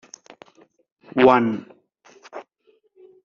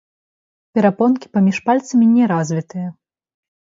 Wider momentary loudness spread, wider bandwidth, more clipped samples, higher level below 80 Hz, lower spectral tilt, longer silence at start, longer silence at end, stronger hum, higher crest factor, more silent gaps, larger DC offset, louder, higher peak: first, 25 LU vs 13 LU; about the same, 7.2 kHz vs 7.8 kHz; neither; about the same, -62 dBFS vs -66 dBFS; second, -4 dB/octave vs -7.5 dB/octave; first, 1.15 s vs 0.75 s; about the same, 0.85 s vs 0.75 s; neither; first, 22 dB vs 16 dB; neither; neither; second, -19 LUFS vs -16 LUFS; about the same, -2 dBFS vs 0 dBFS